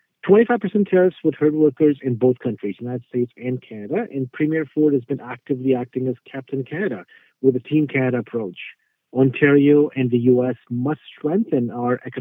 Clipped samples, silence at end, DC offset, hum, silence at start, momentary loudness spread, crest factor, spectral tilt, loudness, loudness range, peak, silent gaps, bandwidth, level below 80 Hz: under 0.1%; 0 s; under 0.1%; none; 0.25 s; 13 LU; 18 dB; -11 dB/octave; -20 LUFS; 5 LU; -2 dBFS; none; 3.8 kHz; -70 dBFS